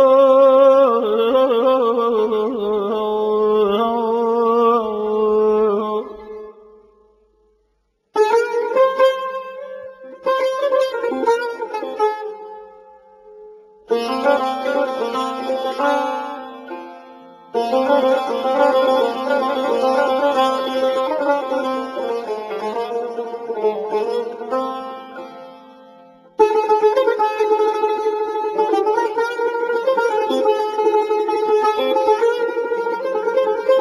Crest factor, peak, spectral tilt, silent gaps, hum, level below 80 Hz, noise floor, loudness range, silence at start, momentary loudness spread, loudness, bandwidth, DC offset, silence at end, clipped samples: 16 dB; -2 dBFS; -4.5 dB/octave; none; none; -64 dBFS; -66 dBFS; 6 LU; 0 s; 12 LU; -18 LUFS; 13.5 kHz; under 0.1%; 0 s; under 0.1%